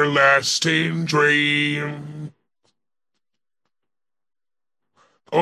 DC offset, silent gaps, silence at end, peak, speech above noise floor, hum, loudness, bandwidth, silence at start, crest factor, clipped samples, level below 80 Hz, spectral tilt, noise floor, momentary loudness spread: under 0.1%; none; 0 s; -2 dBFS; 70 dB; none; -18 LUFS; 14.5 kHz; 0 s; 20 dB; under 0.1%; -68 dBFS; -3.5 dB/octave; -89 dBFS; 19 LU